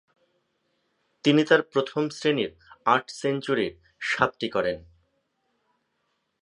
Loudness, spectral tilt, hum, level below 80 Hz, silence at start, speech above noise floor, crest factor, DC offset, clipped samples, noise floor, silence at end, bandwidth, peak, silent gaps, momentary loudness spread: -25 LUFS; -5 dB/octave; none; -62 dBFS; 1.25 s; 51 dB; 24 dB; under 0.1%; under 0.1%; -75 dBFS; 1.65 s; 10.5 kHz; -4 dBFS; none; 9 LU